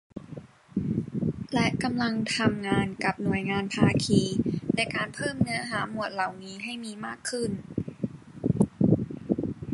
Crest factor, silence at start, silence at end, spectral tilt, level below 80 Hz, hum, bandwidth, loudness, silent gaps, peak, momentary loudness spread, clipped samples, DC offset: 20 dB; 0.15 s; 0 s; -5.5 dB/octave; -52 dBFS; none; 11.5 kHz; -28 LUFS; none; -8 dBFS; 11 LU; under 0.1%; under 0.1%